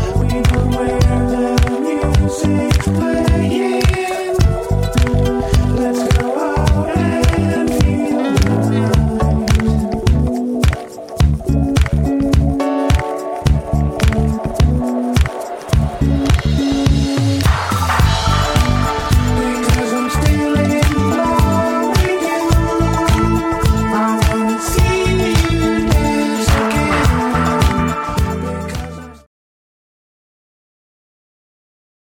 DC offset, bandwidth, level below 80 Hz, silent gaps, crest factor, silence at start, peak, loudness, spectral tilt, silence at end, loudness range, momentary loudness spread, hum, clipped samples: under 0.1%; 17 kHz; -20 dBFS; none; 14 dB; 0 s; -2 dBFS; -15 LUFS; -6 dB/octave; 2.9 s; 2 LU; 3 LU; none; under 0.1%